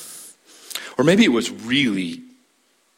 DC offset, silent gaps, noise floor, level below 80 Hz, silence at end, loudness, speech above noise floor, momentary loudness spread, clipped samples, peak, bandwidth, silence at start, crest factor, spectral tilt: under 0.1%; none; -63 dBFS; -60 dBFS; 0.75 s; -19 LUFS; 44 dB; 21 LU; under 0.1%; -4 dBFS; 16.5 kHz; 0 s; 18 dB; -4.5 dB/octave